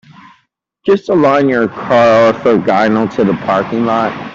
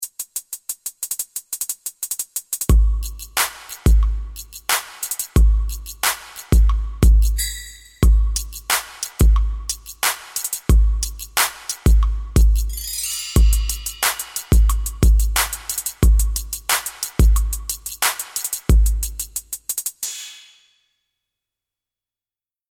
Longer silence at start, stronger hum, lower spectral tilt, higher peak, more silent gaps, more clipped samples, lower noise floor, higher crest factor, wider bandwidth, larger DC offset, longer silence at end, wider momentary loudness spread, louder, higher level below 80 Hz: first, 0.85 s vs 0 s; neither; first, -7 dB/octave vs -3.5 dB/octave; about the same, -2 dBFS vs -2 dBFS; neither; neither; second, -59 dBFS vs under -90 dBFS; second, 10 dB vs 18 dB; second, 7.6 kHz vs 18.5 kHz; neither; second, 0 s vs 2.35 s; second, 6 LU vs 10 LU; first, -12 LUFS vs -20 LUFS; second, -50 dBFS vs -20 dBFS